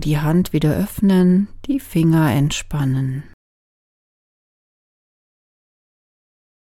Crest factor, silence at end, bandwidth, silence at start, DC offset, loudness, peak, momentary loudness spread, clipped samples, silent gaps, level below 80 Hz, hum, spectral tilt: 16 dB; 3.45 s; 16 kHz; 0 s; under 0.1%; -18 LUFS; -4 dBFS; 8 LU; under 0.1%; none; -40 dBFS; none; -7 dB/octave